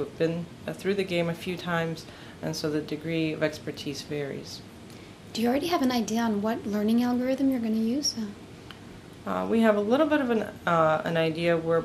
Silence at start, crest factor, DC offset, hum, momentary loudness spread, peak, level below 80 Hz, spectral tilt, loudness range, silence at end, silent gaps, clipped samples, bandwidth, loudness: 0 s; 20 dB; under 0.1%; none; 18 LU; -8 dBFS; -60 dBFS; -5.5 dB/octave; 5 LU; 0 s; none; under 0.1%; 15.5 kHz; -27 LUFS